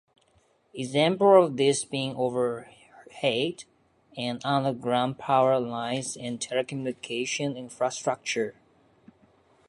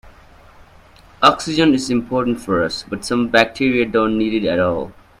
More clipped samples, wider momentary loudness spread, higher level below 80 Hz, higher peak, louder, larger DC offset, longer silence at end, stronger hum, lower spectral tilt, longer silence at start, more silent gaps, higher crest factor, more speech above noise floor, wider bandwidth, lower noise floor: neither; first, 12 LU vs 7 LU; second, -72 dBFS vs -46 dBFS; second, -6 dBFS vs 0 dBFS; second, -26 LUFS vs -17 LUFS; neither; first, 1.15 s vs 0.3 s; neither; about the same, -4.5 dB/octave vs -5 dB/octave; first, 0.75 s vs 0.05 s; neither; about the same, 22 dB vs 18 dB; first, 40 dB vs 29 dB; second, 11.5 kHz vs 14.5 kHz; first, -66 dBFS vs -46 dBFS